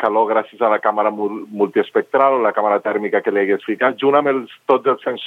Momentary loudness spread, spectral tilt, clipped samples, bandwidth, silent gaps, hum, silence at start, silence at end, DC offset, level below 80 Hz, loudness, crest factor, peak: 5 LU; -7 dB/octave; under 0.1%; 4.2 kHz; none; none; 0 s; 0 s; under 0.1%; -78 dBFS; -17 LUFS; 16 dB; 0 dBFS